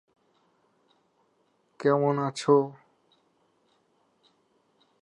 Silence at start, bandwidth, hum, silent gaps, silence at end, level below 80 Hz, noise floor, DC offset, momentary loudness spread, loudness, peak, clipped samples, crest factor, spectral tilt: 1.8 s; 10.5 kHz; none; none; 2.3 s; -86 dBFS; -70 dBFS; under 0.1%; 6 LU; -25 LUFS; -10 dBFS; under 0.1%; 22 dB; -6.5 dB/octave